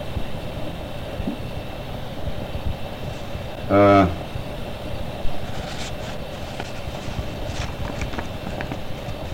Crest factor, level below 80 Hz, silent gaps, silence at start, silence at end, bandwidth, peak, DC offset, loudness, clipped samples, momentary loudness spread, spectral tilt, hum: 18 dB; -36 dBFS; none; 0 s; 0 s; 16.5 kHz; -6 dBFS; under 0.1%; -26 LUFS; under 0.1%; 13 LU; -6.5 dB/octave; none